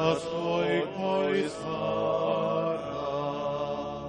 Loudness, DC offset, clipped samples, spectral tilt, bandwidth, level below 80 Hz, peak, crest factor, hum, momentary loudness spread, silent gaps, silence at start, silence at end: -29 LUFS; under 0.1%; under 0.1%; -6 dB/octave; 10.5 kHz; -58 dBFS; -10 dBFS; 18 dB; none; 5 LU; none; 0 s; 0 s